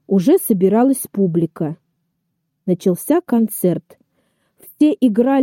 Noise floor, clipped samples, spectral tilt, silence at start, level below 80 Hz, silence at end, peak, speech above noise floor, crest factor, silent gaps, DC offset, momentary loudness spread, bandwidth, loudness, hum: -72 dBFS; under 0.1%; -7 dB/octave; 0.1 s; -64 dBFS; 0 s; -4 dBFS; 56 dB; 14 dB; none; under 0.1%; 12 LU; 16.5 kHz; -17 LUFS; none